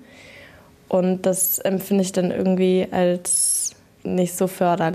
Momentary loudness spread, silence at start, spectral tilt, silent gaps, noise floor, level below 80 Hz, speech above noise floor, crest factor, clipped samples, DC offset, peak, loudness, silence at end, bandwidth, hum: 6 LU; 0 s; -4.5 dB/octave; none; -47 dBFS; -60 dBFS; 28 dB; 14 dB; under 0.1%; under 0.1%; -8 dBFS; -20 LUFS; 0 s; 15 kHz; none